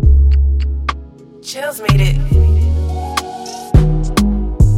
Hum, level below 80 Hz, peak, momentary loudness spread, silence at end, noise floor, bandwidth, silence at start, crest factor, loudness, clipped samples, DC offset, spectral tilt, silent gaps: none; -14 dBFS; 0 dBFS; 14 LU; 0 s; -34 dBFS; 15 kHz; 0 s; 12 dB; -15 LUFS; under 0.1%; under 0.1%; -6.5 dB/octave; none